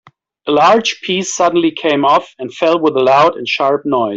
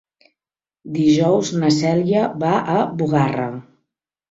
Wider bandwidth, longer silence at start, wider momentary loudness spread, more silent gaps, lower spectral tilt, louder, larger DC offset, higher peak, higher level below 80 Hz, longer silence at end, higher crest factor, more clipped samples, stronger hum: about the same, 8 kHz vs 8 kHz; second, 0.45 s vs 0.85 s; second, 7 LU vs 10 LU; neither; second, -4 dB/octave vs -6.5 dB/octave; first, -13 LUFS vs -18 LUFS; neither; about the same, -2 dBFS vs -4 dBFS; about the same, -58 dBFS vs -58 dBFS; second, 0 s vs 0.7 s; about the same, 12 dB vs 16 dB; neither; neither